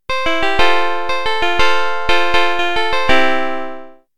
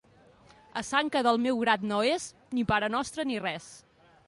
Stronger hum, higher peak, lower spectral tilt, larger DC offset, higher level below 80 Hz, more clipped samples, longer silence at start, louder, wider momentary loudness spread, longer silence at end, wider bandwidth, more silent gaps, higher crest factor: neither; first, 0 dBFS vs -12 dBFS; about the same, -3 dB/octave vs -4 dB/octave; first, 20% vs under 0.1%; first, -36 dBFS vs -60 dBFS; neither; second, 0 s vs 0.75 s; first, -16 LUFS vs -28 LUFS; second, 7 LU vs 11 LU; second, 0 s vs 0.5 s; first, 17 kHz vs 11.5 kHz; neither; about the same, 16 dB vs 18 dB